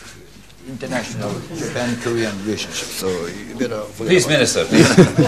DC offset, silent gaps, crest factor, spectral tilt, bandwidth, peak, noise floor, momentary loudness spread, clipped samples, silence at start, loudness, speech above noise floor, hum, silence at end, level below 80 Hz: 0.5%; none; 18 dB; -4.5 dB/octave; 14 kHz; 0 dBFS; -43 dBFS; 14 LU; under 0.1%; 0 s; -18 LUFS; 25 dB; none; 0 s; -48 dBFS